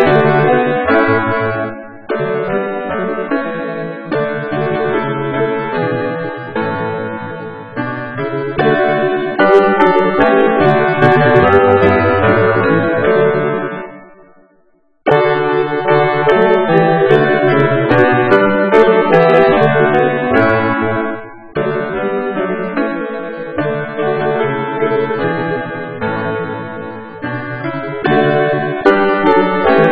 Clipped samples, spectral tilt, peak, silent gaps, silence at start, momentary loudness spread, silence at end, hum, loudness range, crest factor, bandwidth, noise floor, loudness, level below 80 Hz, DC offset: 0.1%; -8.5 dB/octave; 0 dBFS; none; 0 s; 12 LU; 0 s; none; 8 LU; 14 dB; 5.6 kHz; -56 dBFS; -13 LUFS; -44 dBFS; 1%